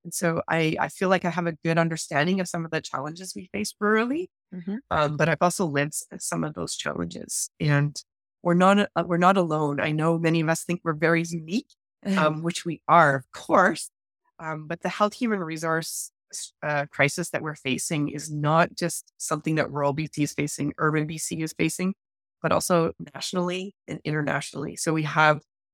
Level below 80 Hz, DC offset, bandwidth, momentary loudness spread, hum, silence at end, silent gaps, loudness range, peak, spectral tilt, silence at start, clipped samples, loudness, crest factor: -62 dBFS; under 0.1%; 17.5 kHz; 12 LU; none; 0.35 s; none; 4 LU; -4 dBFS; -5 dB/octave; 0.05 s; under 0.1%; -25 LUFS; 22 dB